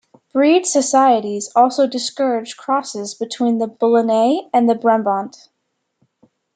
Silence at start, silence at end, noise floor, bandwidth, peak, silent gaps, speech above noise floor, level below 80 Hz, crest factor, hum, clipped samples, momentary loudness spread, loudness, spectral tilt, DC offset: 0.35 s; 1.25 s; -73 dBFS; 9.4 kHz; -2 dBFS; none; 56 dB; -72 dBFS; 16 dB; none; under 0.1%; 10 LU; -17 LUFS; -3.5 dB/octave; under 0.1%